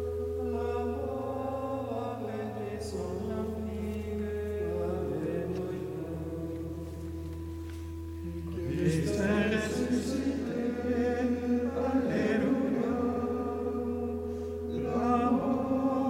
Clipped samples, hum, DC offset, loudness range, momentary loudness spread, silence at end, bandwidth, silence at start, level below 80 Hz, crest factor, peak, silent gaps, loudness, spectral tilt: under 0.1%; none; under 0.1%; 6 LU; 10 LU; 0 s; 16.5 kHz; 0 s; -48 dBFS; 16 dB; -16 dBFS; none; -32 LUFS; -7 dB/octave